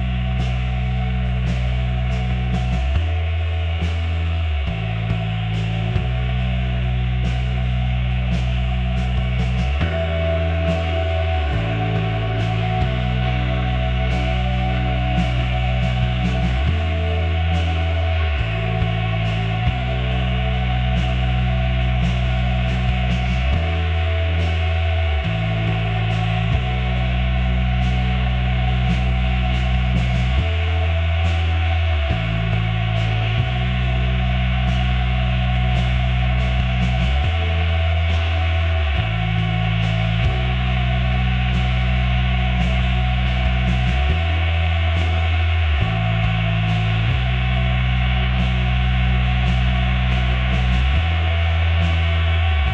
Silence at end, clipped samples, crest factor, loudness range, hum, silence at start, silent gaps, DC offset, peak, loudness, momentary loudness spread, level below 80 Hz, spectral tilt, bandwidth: 0 s; under 0.1%; 14 dB; 2 LU; none; 0 s; none; under 0.1%; -4 dBFS; -20 LUFS; 3 LU; -22 dBFS; -7 dB/octave; 7.4 kHz